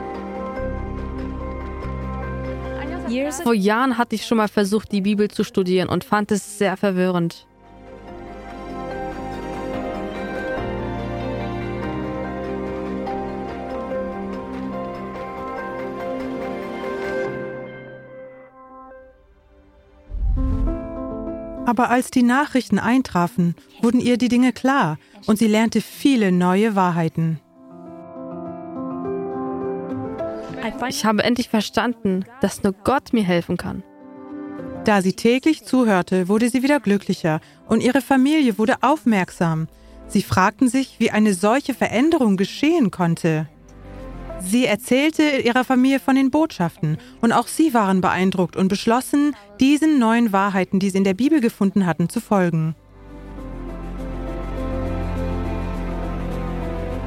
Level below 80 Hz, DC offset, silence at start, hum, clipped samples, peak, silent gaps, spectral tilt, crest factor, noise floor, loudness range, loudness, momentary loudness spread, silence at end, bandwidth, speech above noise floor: -36 dBFS; under 0.1%; 0 s; none; under 0.1%; -2 dBFS; none; -6 dB/octave; 18 dB; -52 dBFS; 10 LU; -21 LUFS; 14 LU; 0 s; 16 kHz; 33 dB